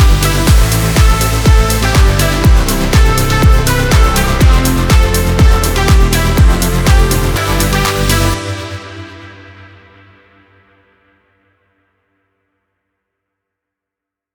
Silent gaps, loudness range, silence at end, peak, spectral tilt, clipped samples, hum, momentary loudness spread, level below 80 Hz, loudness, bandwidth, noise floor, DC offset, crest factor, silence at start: none; 8 LU; 5.05 s; 0 dBFS; -4.5 dB/octave; under 0.1%; none; 4 LU; -14 dBFS; -11 LUFS; over 20 kHz; -83 dBFS; under 0.1%; 10 dB; 0 s